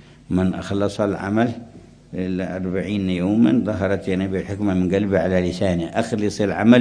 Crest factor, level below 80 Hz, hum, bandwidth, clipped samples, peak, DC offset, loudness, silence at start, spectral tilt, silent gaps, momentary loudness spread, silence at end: 20 dB; -48 dBFS; none; 10.5 kHz; under 0.1%; 0 dBFS; under 0.1%; -21 LUFS; 0.3 s; -7 dB/octave; none; 7 LU; 0 s